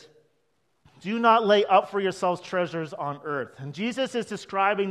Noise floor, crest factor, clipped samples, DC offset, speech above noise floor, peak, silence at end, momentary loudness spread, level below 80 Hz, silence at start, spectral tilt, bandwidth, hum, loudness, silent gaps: -72 dBFS; 18 dB; under 0.1%; under 0.1%; 48 dB; -6 dBFS; 0 s; 13 LU; -72 dBFS; 1.05 s; -5 dB/octave; 12 kHz; none; -25 LUFS; none